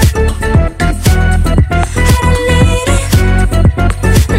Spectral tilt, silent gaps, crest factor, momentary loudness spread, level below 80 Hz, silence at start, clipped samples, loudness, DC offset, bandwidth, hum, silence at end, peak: -5.5 dB/octave; none; 8 dB; 3 LU; -12 dBFS; 0 s; under 0.1%; -11 LUFS; under 0.1%; 16.5 kHz; none; 0 s; 0 dBFS